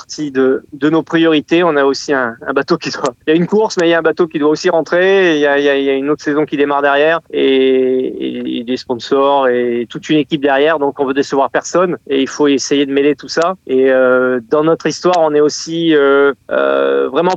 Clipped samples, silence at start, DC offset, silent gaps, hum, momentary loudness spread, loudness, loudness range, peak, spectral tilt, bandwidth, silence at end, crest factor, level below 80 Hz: under 0.1%; 0.1 s; under 0.1%; none; none; 6 LU; -13 LUFS; 2 LU; 0 dBFS; -4.5 dB/octave; 8.2 kHz; 0 s; 12 dB; -60 dBFS